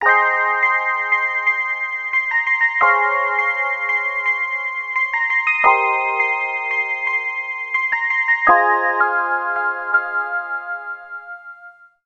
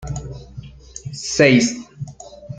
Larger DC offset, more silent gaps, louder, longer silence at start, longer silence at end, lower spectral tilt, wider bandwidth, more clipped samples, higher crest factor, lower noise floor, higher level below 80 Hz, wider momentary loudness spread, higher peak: neither; neither; about the same, -17 LUFS vs -16 LUFS; about the same, 0 s vs 0 s; first, 0.35 s vs 0 s; second, -2.5 dB/octave vs -4.5 dB/octave; second, 7.8 kHz vs 9.4 kHz; neither; about the same, 18 dB vs 20 dB; first, -44 dBFS vs -38 dBFS; second, -62 dBFS vs -42 dBFS; second, 9 LU vs 25 LU; about the same, -2 dBFS vs -2 dBFS